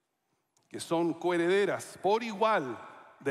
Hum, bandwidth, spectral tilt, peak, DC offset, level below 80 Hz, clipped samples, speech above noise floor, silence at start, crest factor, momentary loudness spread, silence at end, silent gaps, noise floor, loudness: none; 14 kHz; -5 dB/octave; -16 dBFS; under 0.1%; -82 dBFS; under 0.1%; 50 dB; 0.75 s; 16 dB; 16 LU; 0 s; none; -79 dBFS; -30 LUFS